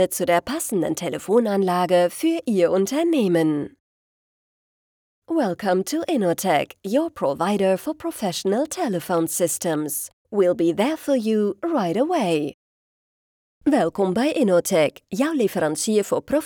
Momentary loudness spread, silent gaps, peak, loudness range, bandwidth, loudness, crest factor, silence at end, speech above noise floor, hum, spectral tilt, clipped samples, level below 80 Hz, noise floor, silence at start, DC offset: 6 LU; 3.80-5.22 s, 10.13-10.25 s, 12.54-13.61 s; -6 dBFS; 3 LU; over 20 kHz; -22 LUFS; 14 dB; 0 s; over 69 dB; none; -5 dB/octave; under 0.1%; -62 dBFS; under -90 dBFS; 0 s; under 0.1%